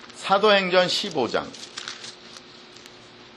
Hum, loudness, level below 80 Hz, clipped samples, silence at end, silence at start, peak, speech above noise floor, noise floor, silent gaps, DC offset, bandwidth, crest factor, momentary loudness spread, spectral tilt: none; -21 LUFS; -66 dBFS; under 0.1%; 0.15 s; 0 s; -6 dBFS; 25 dB; -46 dBFS; none; under 0.1%; 12.5 kHz; 20 dB; 25 LU; -3.5 dB/octave